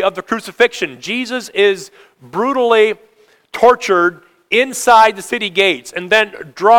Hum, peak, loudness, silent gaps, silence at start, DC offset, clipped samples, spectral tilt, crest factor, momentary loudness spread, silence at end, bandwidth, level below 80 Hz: none; 0 dBFS; -14 LUFS; none; 0 s; under 0.1%; 0.3%; -3 dB/octave; 14 dB; 11 LU; 0 s; 18.5 kHz; -56 dBFS